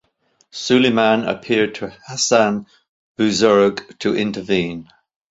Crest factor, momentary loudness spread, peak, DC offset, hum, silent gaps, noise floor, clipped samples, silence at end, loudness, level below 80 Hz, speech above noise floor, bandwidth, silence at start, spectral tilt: 18 dB; 14 LU; -2 dBFS; under 0.1%; none; 2.89-3.15 s; -62 dBFS; under 0.1%; 0.5 s; -18 LUFS; -56 dBFS; 45 dB; 8 kHz; 0.55 s; -4 dB/octave